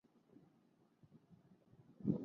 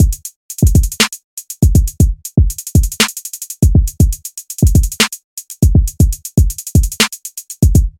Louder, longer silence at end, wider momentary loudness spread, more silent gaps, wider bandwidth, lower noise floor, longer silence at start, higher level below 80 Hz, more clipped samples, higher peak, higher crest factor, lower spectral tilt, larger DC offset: second, -44 LUFS vs -14 LUFS; about the same, 0 s vs 0.1 s; first, 24 LU vs 13 LU; second, none vs 0.36-0.49 s, 1.24-1.37 s, 5.24-5.37 s; second, 4.3 kHz vs 17 kHz; first, -74 dBFS vs -30 dBFS; first, 1.15 s vs 0 s; second, -78 dBFS vs -16 dBFS; neither; second, -24 dBFS vs 0 dBFS; first, 26 dB vs 12 dB; first, -12 dB/octave vs -4.5 dB/octave; neither